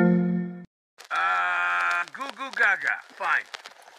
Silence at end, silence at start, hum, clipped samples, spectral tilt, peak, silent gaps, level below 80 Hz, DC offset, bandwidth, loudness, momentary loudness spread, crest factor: 0.3 s; 0 s; none; under 0.1%; -6 dB/octave; -8 dBFS; 0.67-0.97 s; -76 dBFS; under 0.1%; 11 kHz; -25 LUFS; 14 LU; 18 dB